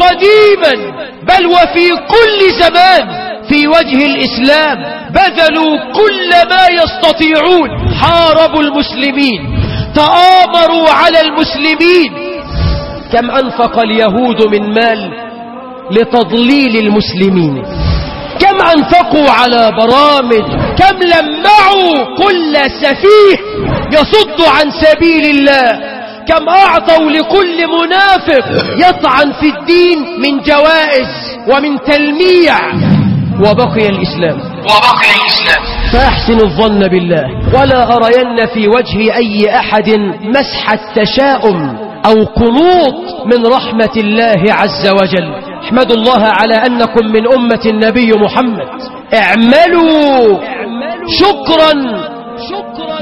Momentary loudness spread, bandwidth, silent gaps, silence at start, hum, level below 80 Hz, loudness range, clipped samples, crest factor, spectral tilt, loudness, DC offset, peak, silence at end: 9 LU; 16 kHz; none; 0 s; none; -28 dBFS; 3 LU; 1%; 8 dB; -6 dB/octave; -8 LUFS; under 0.1%; 0 dBFS; 0 s